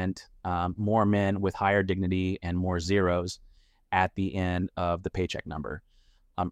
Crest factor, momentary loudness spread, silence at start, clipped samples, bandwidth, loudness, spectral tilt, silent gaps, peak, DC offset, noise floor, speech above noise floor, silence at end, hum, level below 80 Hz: 20 dB; 12 LU; 0 s; under 0.1%; 9.8 kHz; -28 LUFS; -6.5 dB/octave; none; -8 dBFS; under 0.1%; -62 dBFS; 34 dB; 0 s; none; -50 dBFS